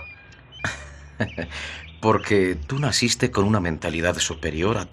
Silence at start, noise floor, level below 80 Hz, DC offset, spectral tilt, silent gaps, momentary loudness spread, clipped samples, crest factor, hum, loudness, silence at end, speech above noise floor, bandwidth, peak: 0 s; -45 dBFS; -44 dBFS; under 0.1%; -4.5 dB/octave; none; 12 LU; under 0.1%; 20 dB; none; -23 LUFS; 0.05 s; 22 dB; 13.5 kHz; -4 dBFS